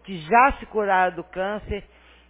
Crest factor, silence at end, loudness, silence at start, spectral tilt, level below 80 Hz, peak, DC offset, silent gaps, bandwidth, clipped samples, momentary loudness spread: 20 dB; 0.5 s; -22 LUFS; 0.05 s; -9 dB/octave; -42 dBFS; -2 dBFS; under 0.1%; none; 4 kHz; under 0.1%; 14 LU